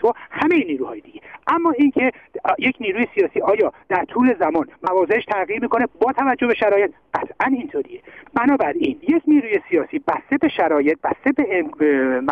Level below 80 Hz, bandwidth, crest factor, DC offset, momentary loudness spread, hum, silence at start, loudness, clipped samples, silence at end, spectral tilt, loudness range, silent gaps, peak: -58 dBFS; 5.2 kHz; 14 dB; under 0.1%; 8 LU; none; 0 s; -19 LUFS; under 0.1%; 0 s; -7.5 dB/octave; 1 LU; none; -6 dBFS